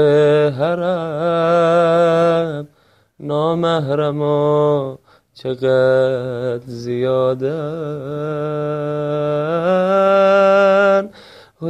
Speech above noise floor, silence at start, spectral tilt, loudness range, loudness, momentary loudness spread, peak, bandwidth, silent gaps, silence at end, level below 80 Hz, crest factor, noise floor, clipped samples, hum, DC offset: 40 dB; 0 s; -7.5 dB/octave; 5 LU; -16 LUFS; 12 LU; -4 dBFS; 10.5 kHz; none; 0 s; -58 dBFS; 12 dB; -56 dBFS; under 0.1%; none; under 0.1%